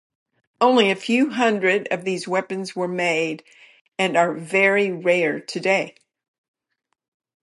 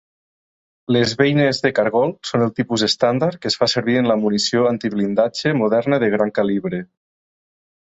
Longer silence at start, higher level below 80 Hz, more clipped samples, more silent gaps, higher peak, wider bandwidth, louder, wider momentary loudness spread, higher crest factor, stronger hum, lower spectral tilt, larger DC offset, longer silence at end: second, 0.6 s vs 0.9 s; second, -76 dBFS vs -58 dBFS; neither; first, 3.81-3.85 s vs none; about the same, -4 dBFS vs -2 dBFS; first, 11.5 kHz vs 8.2 kHz; about the same, -20 LUFS vs -18 LUFS; first, 9 LU vs 4 LU; about the same, 18 dB vs 16 dB; neither; about the same, -4.5 dB/octave vs -5 dB/octave; neither; first, 1.55 s vs 1.1 s